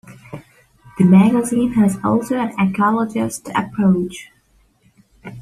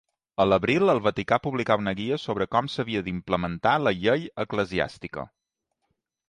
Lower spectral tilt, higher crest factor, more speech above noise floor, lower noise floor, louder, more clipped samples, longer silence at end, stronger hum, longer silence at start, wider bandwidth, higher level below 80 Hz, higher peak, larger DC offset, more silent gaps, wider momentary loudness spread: about the same, -7 dB/octave vs -6.5 dB/octave; about the same, 16 dB vs 20 dB; second, 41 dB vs 56 dB; second, -57 dBFS vs -81 dBFS; first, -17 LUFS vs -25 LUFS; neither; second, 0 s vs 1.05 s; neither; second, 0.1 s vs 0.4 s; first, 13 kHz vs 10.5 kHz; about the same, -52 dBFS vs -52 dBFS; first, -2 dBFS vs -6 dBFS; neither; neither; first, 25 LU vs 10 LU